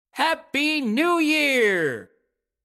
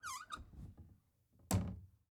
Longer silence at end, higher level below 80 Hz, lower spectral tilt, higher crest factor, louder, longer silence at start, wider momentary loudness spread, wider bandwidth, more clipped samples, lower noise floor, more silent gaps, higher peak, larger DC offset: first, 0.6 s vs 0.2 s; second, -74 dBFS vs -58 dBFS; second, -3.5 dB/octave vs -5 dB/octave; second, 14 dB vs 26 dB; first, -21 LUFS vs -43 LUFS; about the same, 0.15 s vs 0.05 s; second, 6 LU vs 21 LU; second, 16 kHz vs 20 kHz; neither; about the same, -72 dBFS vs -72 dBFS; neither; first, -8 dBFS vs -20 dBFS; neither